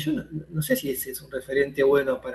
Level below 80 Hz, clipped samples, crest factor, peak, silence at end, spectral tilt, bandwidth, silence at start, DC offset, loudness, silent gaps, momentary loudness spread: -54 dBFS; under 0.1%; 16 dB; -10 dBFS; 0 s; -5 dB/octave; 12.5 kHz; 0 s; under 0.1%; -25 LUFS; none; 11 LU